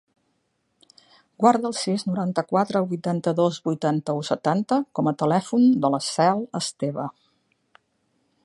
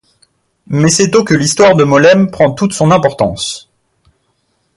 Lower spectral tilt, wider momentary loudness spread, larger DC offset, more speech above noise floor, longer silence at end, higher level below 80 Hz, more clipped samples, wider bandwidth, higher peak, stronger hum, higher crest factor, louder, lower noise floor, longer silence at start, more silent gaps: about the same, -6 dB/octave vs -5 dB/octave; second, 8 LU vs 12 LU; neither; about the same, 50 dB vs 52 dB; first, 1.35 s vs 1.15 s; second, -72 dBFS vs -44 dBFS; neither; about the same, 11.5 kHz vs 11.5 kHz; about the same, -2 dBFS vs 0 dBFS; neither; first, 22 dB vs 12 dB; second, -23 LUFS vs -10 LUFS; first, -72 dBFS vs -61 dBFS; first, 1.4 s vs 0.7 s; neither